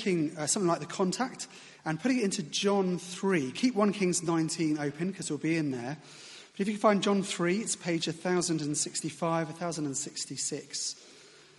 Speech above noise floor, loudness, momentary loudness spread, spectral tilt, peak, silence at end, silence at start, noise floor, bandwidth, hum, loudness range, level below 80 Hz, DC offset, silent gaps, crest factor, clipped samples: 25 dB; -30 LUFS; 9 LU; -4 dB/octave; -10 dBFS; 0.3 s; 0 s; -55 dBFS; 11.5 kHz; none; 2 LU; -74 dBFS; under 0.1%; none; 20 dB; under 0.1%